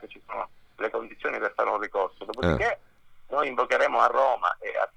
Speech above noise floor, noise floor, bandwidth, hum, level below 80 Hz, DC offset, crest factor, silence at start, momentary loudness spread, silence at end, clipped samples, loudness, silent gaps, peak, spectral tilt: 27 dB; -50 dBFS; 10 kHz; none; -50 dBFS; under 0.1%; 20 dB; 0 s; 14 LU; 0.1 s; under 0.1%; -26 LUFS; none; -6 dBFS; -5.5 dB/octave